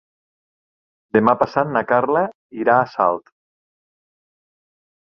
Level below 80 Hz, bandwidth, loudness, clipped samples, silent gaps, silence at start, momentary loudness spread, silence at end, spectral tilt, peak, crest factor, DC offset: -62 dBFS; 6.4 kHz; -18 LUFS; under 0.1%; 2.35-2.50 s; 1.15 s; 6 LU; 1.85 s; -8.5 dB/octave; -2 dBFS; 20 dB; under 0.1%